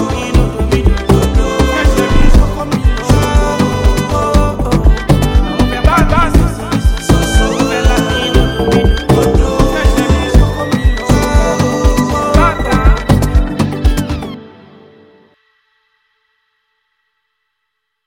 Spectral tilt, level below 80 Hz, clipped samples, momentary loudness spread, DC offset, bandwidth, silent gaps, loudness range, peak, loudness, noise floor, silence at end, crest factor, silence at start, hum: -6 dB/octave; -14 dBFS; under 0.1%; 4 LU; under 0.1%; 16.5 kHz; none; 4 LU; 0 dBFS; -12 LUFS; -71 dBFS; 3.6 s; 12 dB; 0 s; none